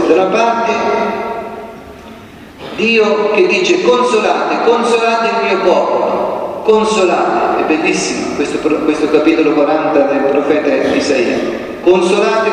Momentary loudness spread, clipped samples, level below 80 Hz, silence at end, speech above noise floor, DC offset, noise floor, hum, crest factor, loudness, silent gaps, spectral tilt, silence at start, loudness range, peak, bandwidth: 8 LU; under 0.1%; -48 dBFS; 0 s; 22 dB; under 0.1%; -34 dBFS; none; 12 dB; -12 LUFS; none; -4.5 dB/octave; 0 s; 3 LU; 0 dBFS; 11.5 kHz